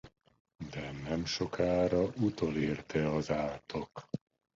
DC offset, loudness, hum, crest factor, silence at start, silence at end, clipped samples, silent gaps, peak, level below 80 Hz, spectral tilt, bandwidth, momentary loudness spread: under 0.1%; -34 LUFS; none; 18 dB; 0.05 s; 0.4 s; under 0.1%; 0.40-0.45 s; -18 dBFS; -56 dBFS; -6 dB/octave; 7.8 kHz; 13 LU